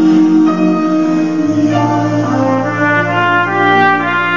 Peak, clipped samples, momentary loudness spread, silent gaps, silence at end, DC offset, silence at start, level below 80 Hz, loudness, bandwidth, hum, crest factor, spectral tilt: 0 dBFS; under 0.1%; 5 LU; none; 0 s; 1%; 0 s; -58 dBFS; -12 LUFS; 7.4 kHz; none; 12 dB; -6.5 dB/octave